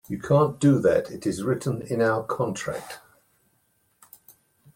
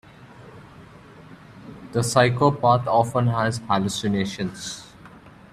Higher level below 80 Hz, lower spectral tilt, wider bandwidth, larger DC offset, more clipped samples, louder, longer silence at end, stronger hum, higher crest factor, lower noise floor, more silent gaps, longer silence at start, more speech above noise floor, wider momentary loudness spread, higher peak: second, -60 dBFS vs -54 dBFS; first, -7 dB/octave vs -5.5 dB/octave; first, 16.5 kHz vs 14 kHz; neither; neither; about the same, -24 LUFS vs -22 LUFS; first, 1.75 s vs 0.25 s; neither; about the same, 18 dB vs 20 dB; first, -68 dBFS vs -46 dBFS; neither; about the same, 0.1 s vs 0.2 s; first, 45 dB vs 25 dB; second, 13 LU vs 18 LU; second, -8 dBFS vs -2 dBFS